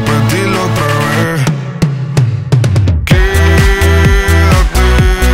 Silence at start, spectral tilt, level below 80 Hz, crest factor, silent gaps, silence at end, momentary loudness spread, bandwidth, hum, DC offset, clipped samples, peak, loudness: 0 s; -5.5 dB/octave; -14 dBFS; 8 dB; none; 0 s; 4 LU; 16.5 kHz; none; under 0.1%; under 0.1%; 0 dBFS; -10 LUFS